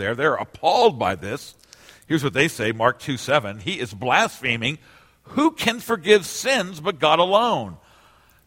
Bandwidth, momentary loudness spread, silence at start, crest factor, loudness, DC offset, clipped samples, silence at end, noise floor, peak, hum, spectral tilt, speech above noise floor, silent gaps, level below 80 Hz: 16.5 kHz; 10 LU; 0 s; 20 dB; -21 LUFS; under 0.1%; under 0.1%; 0.7 s; -55 dBFS; -2 dBFS; none; -4 dB/octave; 33 dB; none; -58 dBFS